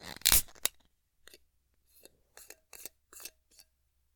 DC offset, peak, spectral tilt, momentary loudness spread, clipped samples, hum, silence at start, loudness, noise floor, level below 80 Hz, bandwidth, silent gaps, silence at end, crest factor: under 0.1%; -2 dBFS; 0.5 dB/octave; 27 LU; under 0.1%; none; 0.05 s; -27 LUFS; -75 dBFS; -50 dBFS; 19 kHz; none; 0.9 s; 34 dB